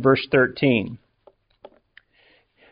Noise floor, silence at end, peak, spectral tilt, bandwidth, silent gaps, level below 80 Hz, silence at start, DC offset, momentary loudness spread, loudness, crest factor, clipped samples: -60 dBFS; 1.75 s; -4 dBFS; -4.5 dB/octave; 5.2 kHz; none; -58 dBFS; 0 s; under 0.1%; 18 LU; -20 LUFS; 18 dB; under 0.1%